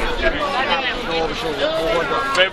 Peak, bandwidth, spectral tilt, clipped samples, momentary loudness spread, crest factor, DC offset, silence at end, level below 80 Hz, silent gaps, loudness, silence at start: 0 dBFS; 14 kHz; -3.5 dB/octave; under 0.1%; 3 LU; 18 dB; under 0.1%; 0 s; -32 dBFS; none; -19 LUFS; 0 s